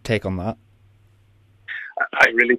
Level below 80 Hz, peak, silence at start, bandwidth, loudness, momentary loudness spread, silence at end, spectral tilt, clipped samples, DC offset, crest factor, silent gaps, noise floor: -52 dBFS; -2 dBFS; 0.05 s; 14 kHz; -21 LUFS; 18 LU; 0 s; -5.5 dB/octave; under 0.1%; under 0.1%; 20 dB; none; -55 dBFS